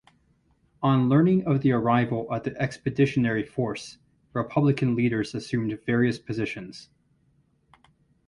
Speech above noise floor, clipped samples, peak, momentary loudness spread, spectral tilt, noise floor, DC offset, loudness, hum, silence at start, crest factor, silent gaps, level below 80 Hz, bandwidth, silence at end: 41 dB; under 0.1%; -8 dBFS; 11 LU; -7.5 dB/octave; -66 dBFS; under 0.1%; -25 LUFS; none; 0.8 s; 18 dB; none; -58 dBFS; 11 kHz; 1.45 s